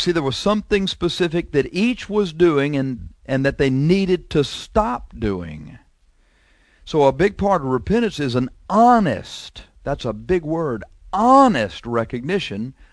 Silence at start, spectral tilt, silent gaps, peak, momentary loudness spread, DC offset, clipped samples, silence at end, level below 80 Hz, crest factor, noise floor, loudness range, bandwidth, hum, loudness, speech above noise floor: 0 s; -6.5 dB/octave; none; -2 dBFS; 13 LU; under 0.1%; under 0.1%; 0.2 s; -40 dBFS; 18 dB; -57 dBFS; 3 LU; 11 kHz; none; -19 LUFS; 38 dB